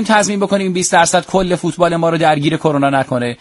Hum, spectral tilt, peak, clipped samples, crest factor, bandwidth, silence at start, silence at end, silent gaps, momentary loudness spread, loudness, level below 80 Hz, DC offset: none; -4.5 dB/octave; 0 dBFS; under 0.1%; 14 dB; 11.5 kHz; 0 s; 0.05 s; none; 4 LU; -14 LUFS; -44 dBFS; under 0.1%